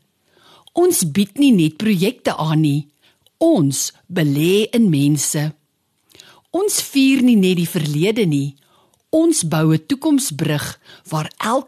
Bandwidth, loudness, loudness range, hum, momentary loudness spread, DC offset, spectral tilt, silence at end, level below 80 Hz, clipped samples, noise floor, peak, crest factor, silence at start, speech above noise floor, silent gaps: 13.5 kHz; -17 LUFS; 2 LU; none; 10 LU; under 0.1%; -5 dB/octave; 0.05 s; -60 dBFS; under 0.1%; -66 dBFS; -6 dBFS; 12 dB; 0.75 s; 50 dB; none